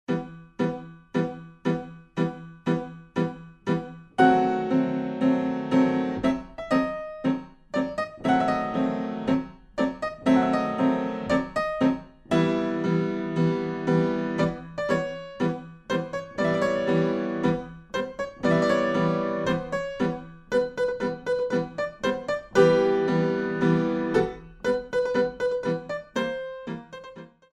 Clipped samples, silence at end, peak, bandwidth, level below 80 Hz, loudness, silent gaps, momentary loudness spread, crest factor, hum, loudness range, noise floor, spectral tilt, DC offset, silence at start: under 0.1%; 0.25 s; -6 dBFS; 9.8 kHz; -54 dBFS; -26 LUFS; none; 10 LU; 20 dB; none; 4 LU; -45 dBFS; -7 dB/octave; under 0.1%; 0.1 s